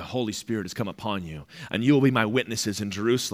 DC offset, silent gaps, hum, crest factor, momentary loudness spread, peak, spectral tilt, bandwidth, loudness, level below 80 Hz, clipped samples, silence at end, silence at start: under 0.1%; none; none; 20 dB; 12 LU; -6 dBFS; -5 dB/octave; 16.5 kHz; -26 LUFS; -60 dBFS; under 0.1%; 0 s; 0 s